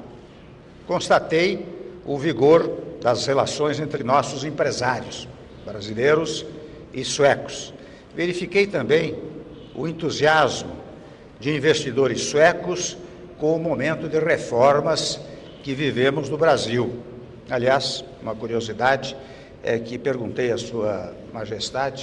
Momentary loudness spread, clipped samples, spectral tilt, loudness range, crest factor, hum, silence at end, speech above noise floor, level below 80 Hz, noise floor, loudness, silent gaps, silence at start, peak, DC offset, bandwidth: 19 LU; under 0.1%; -4.5 dB/octave; 4 LU; 16 dB; none; 0 s; 23 dB; -52 dBFS; -44 dBFS; -22 LUFS; none; 0 s; -6 dBFS; under 0.1%; 11 kHz